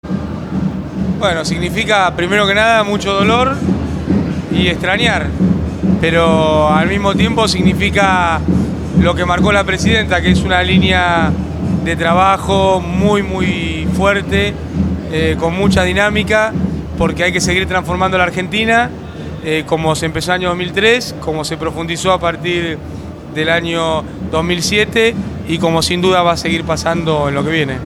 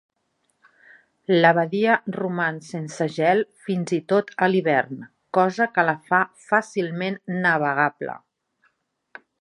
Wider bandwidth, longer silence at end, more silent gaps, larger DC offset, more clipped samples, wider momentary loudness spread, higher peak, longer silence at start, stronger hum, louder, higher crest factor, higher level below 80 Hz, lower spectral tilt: first, 14 kHz vs 11 kHz; second, 0 s vs 1.25 s; neither; neither; neither; second, 8 LU vs 13 LU; about the same, 0 dBFS vs -2 dBFS; second, 0.05 s vs 1.3 s; neither; first, -14 LUFS vs -22 LUFS; second, 14 dB vs 20 dB; first, -30 dBFS vs -74 dBFS; about the same, -5 dB/octave vs -6 dB/octave